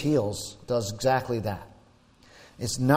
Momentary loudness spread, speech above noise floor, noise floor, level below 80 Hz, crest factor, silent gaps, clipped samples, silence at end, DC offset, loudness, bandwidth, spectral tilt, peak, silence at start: 10 LU; 31 dB; -57 dBFS; -52 dBFS; 20 dB; none; under 0.1%; 0 s; under 0.1%; -29 LUFS; 16 kHz; -5.5 dB/octave; -8 dBFS; 0 s